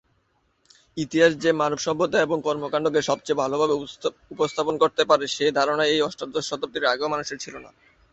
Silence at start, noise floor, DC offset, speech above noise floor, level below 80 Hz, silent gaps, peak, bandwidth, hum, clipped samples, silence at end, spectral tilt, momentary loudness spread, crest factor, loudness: 0.95 s; -68 dBFS; under 0.1%; 45 dB; -62 dBFS; none; -2 dBFS; 8.2 kHz; none; under 0.1%; 0.45 s; -4 dB/octave; 11 LU; 20 dB; -23 LUFS